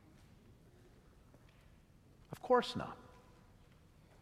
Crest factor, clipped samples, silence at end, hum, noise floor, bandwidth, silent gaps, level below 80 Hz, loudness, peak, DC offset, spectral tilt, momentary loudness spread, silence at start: 26 dB; under 0.1%; 1.15 s; none; -64 dBFS; 14.5 kHz; none; -68 dBFS; -37 LUFS; -18 dBFS; under 0.1%; -5 dB/octave; 27 LU; 2.3 s